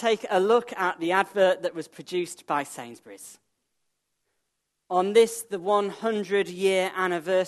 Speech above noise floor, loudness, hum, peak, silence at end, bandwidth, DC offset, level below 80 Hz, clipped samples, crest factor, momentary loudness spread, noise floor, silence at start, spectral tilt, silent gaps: 54 dB; -25 LUFS; none; -6 dBFS; 0 s; 13 kHz; under 0.1%; -80 dBFS; under 0.1%; 20 dB; 17 LU; -79 dBFS; 0 s; -4 dB/octave; none